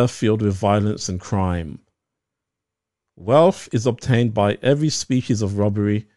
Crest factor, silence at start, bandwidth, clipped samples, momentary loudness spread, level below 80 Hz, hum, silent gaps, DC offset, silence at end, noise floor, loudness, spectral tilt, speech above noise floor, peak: 18 dB; 0 s; 11 kHz; under 0.1%; 8 LU; -48 dBFS; none; none; 0.3%; 0.15 s; -84 dBFS; -20 LUFS; -6 dB/octave; 65 dB; -2 dBFS